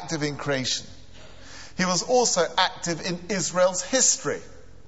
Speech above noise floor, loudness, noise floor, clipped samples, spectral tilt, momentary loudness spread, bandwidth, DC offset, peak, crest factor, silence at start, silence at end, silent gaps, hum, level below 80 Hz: 23 dB; -23 LUFS; -47 dBFS; under 0.1%; -2.5 dB/octave; 12 LU; 8.2 kHz; 0.7%; -6 dBFS; 20 dB; 0 s; 0.3 s; none; none; -56 dBFS